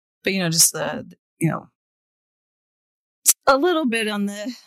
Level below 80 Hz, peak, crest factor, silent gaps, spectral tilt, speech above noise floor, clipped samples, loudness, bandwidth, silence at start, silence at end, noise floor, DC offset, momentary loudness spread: -62 dBFS; -2 dBFS; 20 dB; 1.19-1.37 s, 1.75-3.22 s; -3 dB/octave; over 69 dB; under 0.1%; -19 LUFS; 16 kHz; 0.25 s; 0.1 s; under -90 dBFS; under 0.1%; 12 LU